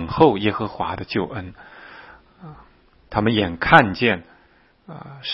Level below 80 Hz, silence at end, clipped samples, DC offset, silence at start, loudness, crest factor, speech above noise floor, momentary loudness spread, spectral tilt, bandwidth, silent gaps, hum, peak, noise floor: -46 dBFS; 0 s; under 0.1%; under 0.1%; 0 s; -19 LUFS; 22 dB; 36 dB; 26 LU; -7.5 dB/octave; 7 kHz; none; none; 0 dBFS; -56 dBFS